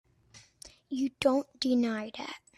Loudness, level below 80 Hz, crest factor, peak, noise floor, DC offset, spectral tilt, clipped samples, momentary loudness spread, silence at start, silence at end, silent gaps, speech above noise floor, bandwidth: -31 LUFS; -66 dBFS; 20 dB; -12 dBFS; -59 dBFS; under 0.1%; -4.5 dB/octave; under 0.1%; 23 LU; 0.35 s; 0.2 s; none; 29 dB; 12.5 kHz